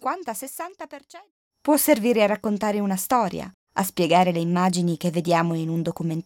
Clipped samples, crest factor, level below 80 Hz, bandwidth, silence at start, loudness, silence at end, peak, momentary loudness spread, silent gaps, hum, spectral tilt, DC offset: under 0.1%; 18 dB; -62 dBFS; 17 kHz; 0 s; -23 LUFS; 0.05 s; -4 dBFS; 15 LU; 1.31-1.51 s, 3.54-3.67 s; none; -5.5 dB/octave; under 0.1%